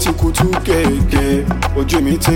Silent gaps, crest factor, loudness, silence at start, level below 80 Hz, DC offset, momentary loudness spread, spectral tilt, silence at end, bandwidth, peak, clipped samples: none; 14 dB; -15 LUFS; 0 s; -20 dBFS; under 0.1%; 2 LU; -5.5 dB/octave; 0 s; 17 kHz; 0 dBFS; under 0.1%